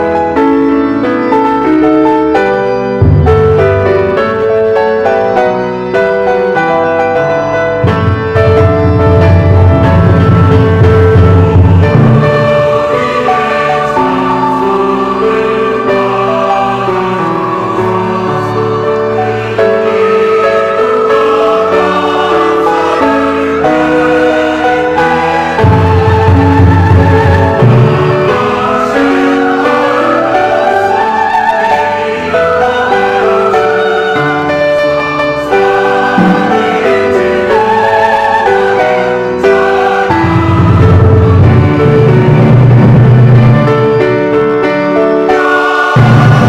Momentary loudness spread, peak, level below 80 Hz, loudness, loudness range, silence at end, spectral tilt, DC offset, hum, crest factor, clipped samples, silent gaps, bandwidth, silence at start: 5 LU; 0 dBFS; -28 dBFS; -8 LUFS; 4 LU; 0 s; -8 dB/octave; under 0.1%; none; 8 dB; 1%; none; 9.4 kHz; 0 s